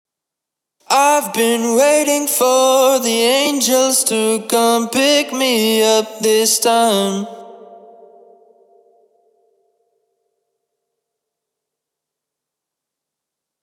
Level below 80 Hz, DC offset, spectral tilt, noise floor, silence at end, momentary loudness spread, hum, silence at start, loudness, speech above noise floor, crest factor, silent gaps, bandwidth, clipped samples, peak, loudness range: -78 dBFS; under 0.1%; -2 dB/octave; -83 dBFS; 5.85 s; 4 LU; none; 0.9 s; -14 LUFS; 68 dB; 16 dB; none; 18.5 kHz; under 0.1%; -2 dBFS; 6 LU